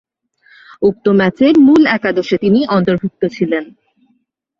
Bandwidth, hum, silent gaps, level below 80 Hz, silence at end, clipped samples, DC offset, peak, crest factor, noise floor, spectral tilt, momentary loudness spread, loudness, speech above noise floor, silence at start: 7.2 kHz; none; none; -52 dBFS; 0.95 s; under 0.1%; under 0.1%; -2 dBFS; 12 dB; -61 dBFS; -7.5 dB/octave; 10 LU; -13 LUFS; 50 dB; 0.8 s